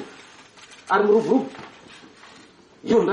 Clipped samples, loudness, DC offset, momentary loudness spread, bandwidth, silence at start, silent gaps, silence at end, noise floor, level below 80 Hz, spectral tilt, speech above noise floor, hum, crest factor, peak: under 0.1%; -20 LUFS; under 0.1%; 26 LU; 10 kHz; 0 s; none; 0 s; -50 dBFS; -64 dBFS; -6 dB/octave; 31 dB; none; 16 dB; -8 dBFS